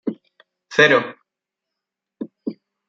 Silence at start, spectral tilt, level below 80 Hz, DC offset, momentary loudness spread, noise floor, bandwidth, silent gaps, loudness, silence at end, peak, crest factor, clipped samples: 0.05 s; -4.5 dB/octave; -68 dBFS; under 0.1%; 21 LU; -84 dBFS; 7.6 kHz; none; -16 LUFS; 0.35 s; -2 dBFS; 22 dB; under 0.1%